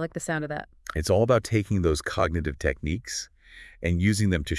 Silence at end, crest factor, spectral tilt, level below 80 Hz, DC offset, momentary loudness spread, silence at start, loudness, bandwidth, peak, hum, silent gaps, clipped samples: 0 s; 20 dB; -5.5 dB/octave; -42 dBFS; under 0.1%; 11 LU; 0 s; -26 LUFS; 12 kHz; -6 dBFS; none; none; under 0.1%